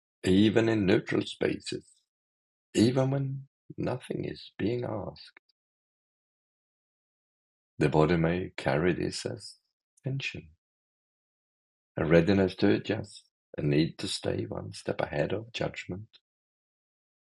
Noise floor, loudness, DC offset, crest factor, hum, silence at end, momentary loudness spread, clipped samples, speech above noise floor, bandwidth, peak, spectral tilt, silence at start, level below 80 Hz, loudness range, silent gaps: under -90 dBFS; -29 LUFS; under 0.1%; 24 dB; none; 1.3 s; 17 LU; under 0.1%; over 62 dB; 12 kHz; -6 dBFS; -6.5 dB/octave; 0.25 s; -60 dBFS; 9 LU; 2.08-2.73 s, 3.47-3.69 s, 5.39-7.77 s, 9.73-9.97 s, 10.58-11.95 s, 13.31-13.53 s